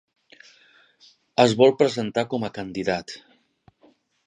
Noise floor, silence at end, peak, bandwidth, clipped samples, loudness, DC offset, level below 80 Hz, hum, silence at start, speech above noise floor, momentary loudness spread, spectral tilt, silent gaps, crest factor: -60 dBFS; 1.1 s; -2 dBFS; 10.5 kHz; under 0.1%; -22 LUFS; under 0.1%; -62 dBFS; none; 1.4 s; 39 dB; 14 LU; -5.5 dB/octave; none; 24 dB